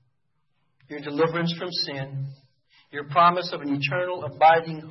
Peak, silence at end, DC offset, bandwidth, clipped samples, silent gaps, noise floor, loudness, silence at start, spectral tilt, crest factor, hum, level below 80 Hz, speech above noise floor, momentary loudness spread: -6 dBFS; 0 s; under 0.1%; 6 kHz; under 0.1%; none; -76 dBFS; -23 LUFS; 0.9 s; -6.5 dB/octave; 20 dB; none; -74 dBFS; 52 dB; 18 LU